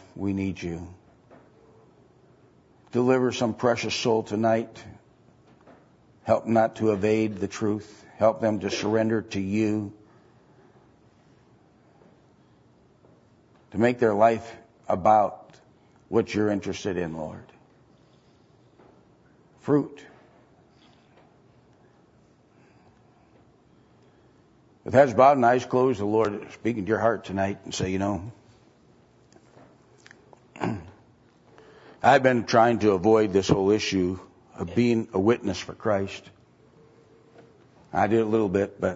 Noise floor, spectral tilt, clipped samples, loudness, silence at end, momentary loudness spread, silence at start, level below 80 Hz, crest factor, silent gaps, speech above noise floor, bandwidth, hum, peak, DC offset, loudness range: -59 dBFS; -6 dB/octave; under 0.1%; -24 LUFS; 0 s; 16 LU; 0.15 s; -60 dBFS; 22 dB; none; 36 dB; 8 kHz; none; -4 dBFS; under 0.1%; 11 LU